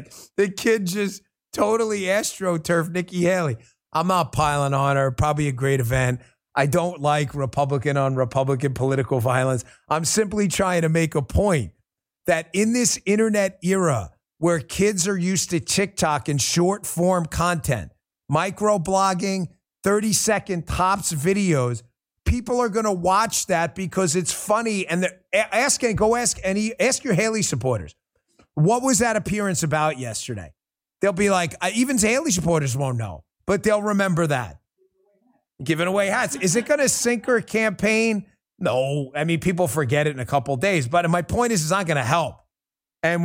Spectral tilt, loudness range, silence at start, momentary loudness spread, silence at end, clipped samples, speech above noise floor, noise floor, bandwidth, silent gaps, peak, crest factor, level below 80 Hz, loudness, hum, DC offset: -4.5 dB/octave; 2 LU; 0 s; 7 LU; 0 s; under 0.1%; over 69 dB; under -90 dBFS; 16.5 kHz; none; -4 dBFS; 18 dB; -44 dBFS; -22 LUFS; none; under 0.1%